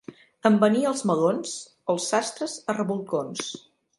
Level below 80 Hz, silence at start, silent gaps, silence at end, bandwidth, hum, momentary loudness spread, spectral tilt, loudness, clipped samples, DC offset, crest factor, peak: -74 dBFS; 0.1 s; none; 0.4 s; 11.5 kHz; none; 13 LU; -4.5 dB/octave; -25 LUFS; under 0.1%; under 0.1%; 22 dB; -4 dBFS